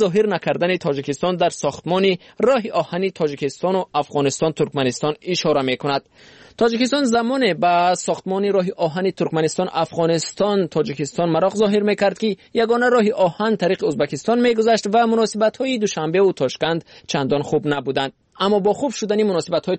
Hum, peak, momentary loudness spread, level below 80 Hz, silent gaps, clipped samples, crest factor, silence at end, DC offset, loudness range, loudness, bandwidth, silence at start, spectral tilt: none; -6 dBFS; 6 LU; -58 dBFS; none; under 0.1%; 12 dB; 0 s; under 0.1%; 3 LU; -19 LUFS; 8.8 kHz; 0 s; -5 dB/octave